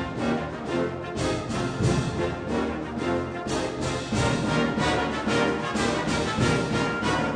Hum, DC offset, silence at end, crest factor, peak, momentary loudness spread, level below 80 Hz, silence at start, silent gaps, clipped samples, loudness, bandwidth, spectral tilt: none; under 0.1%; 0 s; 14 dB; -12 dBFS; 5 LU; -42 dBFS; 0 s; none; under 0.1%; -26 LUFS; 10.5 kHz; -5.5 dB/octave